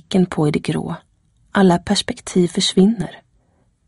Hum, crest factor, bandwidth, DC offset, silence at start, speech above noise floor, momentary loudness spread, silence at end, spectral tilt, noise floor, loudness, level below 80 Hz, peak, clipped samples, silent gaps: none; 16 dB; 11.5 kHz; under 0.1%; 0.1 s; 43 dB; 12 LU; 0.7 s; -5.5 dB/octave; -60 dBFS; -18 LUFS; -48 dBFS; -2 dBFS; under 0.1%; none